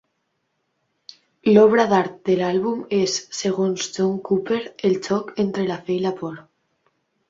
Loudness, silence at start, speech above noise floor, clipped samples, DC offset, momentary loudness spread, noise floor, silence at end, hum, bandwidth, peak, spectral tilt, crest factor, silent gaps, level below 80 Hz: -21 LUFS; 1.45 s; 53 dB; under 0.1%; under 0.1%; 11 LU; -73 dBFS; 0.9 s; none; 7.8 kHz; -2 dBFS; -5 dB/octave; 20 dB; none; -64 dBFS